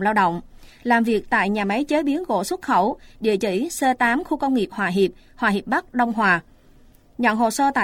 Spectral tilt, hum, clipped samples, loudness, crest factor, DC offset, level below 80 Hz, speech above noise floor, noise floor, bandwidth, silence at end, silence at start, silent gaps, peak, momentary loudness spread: -5 dB/octave; none; under 0.1%; -21 LUFS; 18 dB; under 0.1%; -50 dBFS; 30 dB; -51 dBFS; 16.5 kHz; 0 s; 0 s; none; -4 dBFS; 5 LU